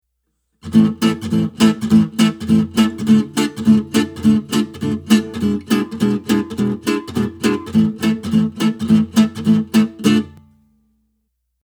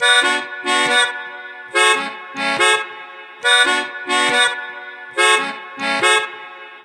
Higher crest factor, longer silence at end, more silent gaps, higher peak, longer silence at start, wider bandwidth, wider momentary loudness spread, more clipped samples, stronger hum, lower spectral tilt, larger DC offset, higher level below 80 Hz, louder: about the same, 16 dB vs 18 dB; first, 1.35 s vs 0.05 s; neither; about the same, 0 dBFS vs -2 dBFS; first, 0.65 s vs 0 s; first, over 20 kHz vs 16 kHz; second, 6 LU vs 17 LU; neither; neither; first, -6 dB/octave vs 0 dB/octave; neither; first, -50 dBFS vs -76 dBFS; about the same, -17 LUFS vs -16 LUFS